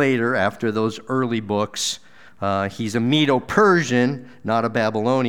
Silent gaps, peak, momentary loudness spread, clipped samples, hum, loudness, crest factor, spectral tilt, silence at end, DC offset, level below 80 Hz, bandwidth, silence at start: none; -4 dBFS; 8 LU; under 0.1%; none; -21 LUFS; 18 dB; -5 dB/octave; 0 s; 0.5%; -58 dBFS; 17 kHz; 0 s